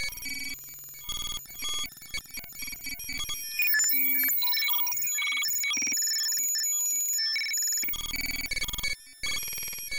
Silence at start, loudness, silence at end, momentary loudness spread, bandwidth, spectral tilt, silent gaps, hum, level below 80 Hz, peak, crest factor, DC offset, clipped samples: 0 s; -27 LUFS; 0 s; 14 LU; 19 kHz; 1.5 dB/octave; none; none; -50 dBFS; -16 dBFS; 14 dB; under 0.1%; under 0.1%